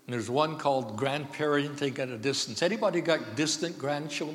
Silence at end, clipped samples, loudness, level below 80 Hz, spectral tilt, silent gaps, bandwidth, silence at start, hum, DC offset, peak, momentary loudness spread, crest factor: 0 s; under 0.1%; -29 LUFS; -80 dBFS; -4 dB/octave; none; 16.5 kHz; 0.1 s; none; under 0.1%; -12 dBFS; 5 LU; 18 dB